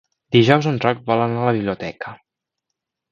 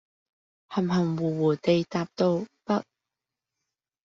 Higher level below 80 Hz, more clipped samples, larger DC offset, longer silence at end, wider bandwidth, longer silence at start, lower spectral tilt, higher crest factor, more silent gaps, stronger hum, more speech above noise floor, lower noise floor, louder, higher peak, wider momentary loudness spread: first, -56 dBFS vs -68 dBFS; neither; neither; second, 0.95 s vs 1.25 s; about the same, 7.4 kHz vs 7.4 kHz; second, 0.3 s vs 0.7 s; about the same, -7 dB/octave vs -6.5 dB/octave; about the same, 20 dB vs 18 dB; neither; neither; about the same, 63 dB vs 63 dB; second, -81 dBFS vs -88 dBFS; first, -18 LUFS vs -27 LUFS; first, 0 dBFS vs -10 dBFS; first, 15 LU vs 6 LU